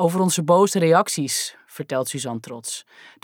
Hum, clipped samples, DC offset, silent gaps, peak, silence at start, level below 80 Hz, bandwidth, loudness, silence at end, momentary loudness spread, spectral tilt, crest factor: none; under 0.1%; under 0.1%; none; -4 dBFS; 0 s; -76 dBFS; 18.5 kHz; -21 LUFS; 0.15 s; 14 LU; -4.5 dB/octave; 18 dB